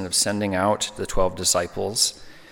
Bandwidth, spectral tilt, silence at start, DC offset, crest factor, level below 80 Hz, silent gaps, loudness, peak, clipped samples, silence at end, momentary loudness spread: 17.5 kHz; -2.5 dB/octave; 0 s; under 0.1%; 18 dB; -38 dBFS; none; -22 LUFS; -6 dBFS; under 0.1%; 0.1 s; 5 LU